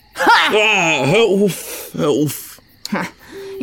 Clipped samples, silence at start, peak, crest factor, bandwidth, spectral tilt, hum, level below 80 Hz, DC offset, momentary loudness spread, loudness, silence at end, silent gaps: under 0.1%; 0.15 s; -2 dBFS; 14 dB; 19 kHz; -4 dB/octave; none; -54 dBFS; under 0.1%; 20 LU; -15 LUFS; 0 s; none